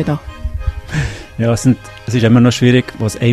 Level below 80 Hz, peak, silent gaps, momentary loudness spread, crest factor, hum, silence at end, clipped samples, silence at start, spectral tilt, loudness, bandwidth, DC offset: -28 dBFS; 0 dBFS; none; 13 LU; 14 dB; none; 0 s; under 0.1%; 0 s; -6.5 dB/octave; -15 LUFS; 13 kHz; under 0.1%